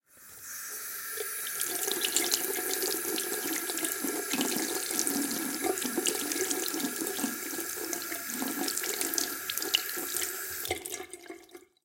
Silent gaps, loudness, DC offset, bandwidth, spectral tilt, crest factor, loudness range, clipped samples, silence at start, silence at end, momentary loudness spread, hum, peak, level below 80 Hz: none; -31 LUFS; under 0.1%; 17 kHz; -0.5 dB/octave; 24 dB; 2 LU; under 0.1%; 0.15 s; 0.25 s; 8 LU; none; -8 dBFS; -74 dBFS